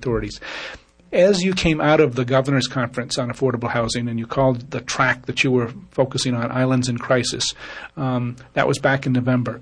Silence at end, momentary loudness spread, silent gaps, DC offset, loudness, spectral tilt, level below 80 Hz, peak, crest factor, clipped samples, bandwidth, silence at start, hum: 0 s; 10 LU; none; under 0.1%; -20 LUFS; -5 dB/octave; -46 dBFS; -4 dBFS; 16 dB; under 0.1%; 10.5 kHz; 0 s; none